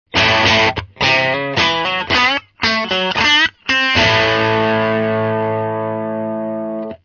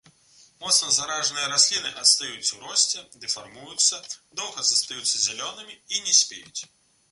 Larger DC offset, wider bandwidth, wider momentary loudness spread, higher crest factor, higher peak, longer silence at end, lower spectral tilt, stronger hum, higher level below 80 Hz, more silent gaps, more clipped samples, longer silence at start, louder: neither; second, 7.2 kHz vs 12 kHz; second, 10 LU vs 16 LU; second, 16 dB vs 22 dB; about the same, 0 dBFS vs -2 dBFS; second, 0.1 s vs 0.45 s; first, -4 dB/octave vs 2 dB/octave; neither; first, -42 dBFS vs -70 dBFS; neither; neither; second, 0.15 s vs 0.6 s; first, -14 LUFS vs -22 LUFS